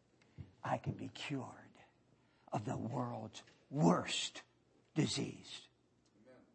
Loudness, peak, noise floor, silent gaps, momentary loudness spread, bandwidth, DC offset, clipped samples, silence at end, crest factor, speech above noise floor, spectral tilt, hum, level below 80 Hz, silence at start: -40 LUFS; -18 dBFS; -73 dBFS; none; 20 LU; 8.4 kHz; under 0.1%; under 0.1%; 0.2 s; 24 dB; 34 dB; -5 dB/octave; none; -74 dBFS; 0.4 s